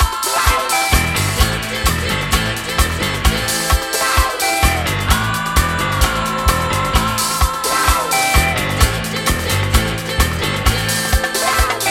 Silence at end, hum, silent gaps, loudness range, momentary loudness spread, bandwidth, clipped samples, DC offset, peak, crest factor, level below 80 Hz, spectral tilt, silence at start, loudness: 0 s; none; none; 1 LU; 3 LU; 17 kHz; under 0.1%; under 0.1%; 0 dBFS; 16 dB; -22 dBFS; -3 dB/octave; 0 s; -16 LUFS